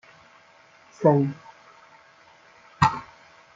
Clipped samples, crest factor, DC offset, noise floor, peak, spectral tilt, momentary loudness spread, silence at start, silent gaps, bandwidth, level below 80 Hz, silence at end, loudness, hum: under 0.1%; 24 dB; under 0.1%; -55 dBFS; -4 dBFS; -7 dB/octave; 16 LU; 1 s; none; 7.6 kHz; -56 dBFS; 0.5 s; -23 LUFS; none